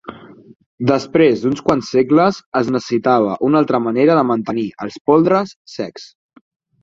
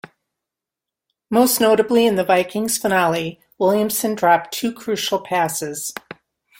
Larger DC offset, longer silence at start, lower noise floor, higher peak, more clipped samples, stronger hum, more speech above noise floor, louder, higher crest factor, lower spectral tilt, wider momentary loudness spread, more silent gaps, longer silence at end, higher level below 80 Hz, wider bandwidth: neither; second, 0.05 s vs 1.3 s; second, -36 dBFS vs -86 dBFS; about the same, 0 dBFS vs -2 dBFS; neither; neither; second, 21 dB vs 67 dB; about the same, -16 LUFS vs -18 LUFS; about the same, 16 dB vs 18 dB; first, -7 dB/octave vs -3.5 dB/octave; first, 13 LU vs 10 LU; first, 0.56-0.60 s, 0.66-0.78 s, 2.46-2.52 s, 5.01-5.05 s, 5.56-5.65 s vs none; about the same, 0.75 s vs 0.7 s; first, -54 dBFS vs -62 dBFS; second, 7.6 kHz vs 17 kHz